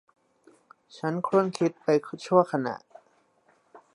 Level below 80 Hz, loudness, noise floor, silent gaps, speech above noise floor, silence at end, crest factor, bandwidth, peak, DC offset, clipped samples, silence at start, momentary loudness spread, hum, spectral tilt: -78 dBFS; -26 LUFS; -66 dBFS; none; 40 dB; 0.15 s; 22 dB; 11.5 kHz; -6 dBFS; under 0.1%; under 0.1%; 0.95 s; 11 LU; none; -6.5 dB/octave